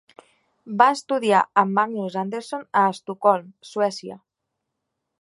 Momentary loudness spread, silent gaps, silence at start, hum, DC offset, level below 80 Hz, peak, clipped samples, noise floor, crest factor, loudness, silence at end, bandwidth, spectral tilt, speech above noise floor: 13 LU; none; 0.65 s; none; under 0.1%; -76 dBFS; 0 dBFS; under 0.1%; -81 dBFS; 22 dB; -21 LUFS; 1.05 s; 11.5 kHz; -5 dB/octave; 59 dB